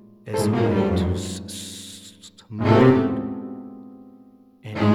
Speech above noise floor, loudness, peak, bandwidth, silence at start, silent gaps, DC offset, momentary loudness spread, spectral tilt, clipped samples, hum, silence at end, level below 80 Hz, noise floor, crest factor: 31 dB; -21 LUFS; -2 dBFS; 14.5 kHz; 0.25 s; none; under 0.1%; 24 LU; -6.5 dB/octave; under 0.1%; none; 0 s; -48 dBFS; -50 dBFS; 20 dB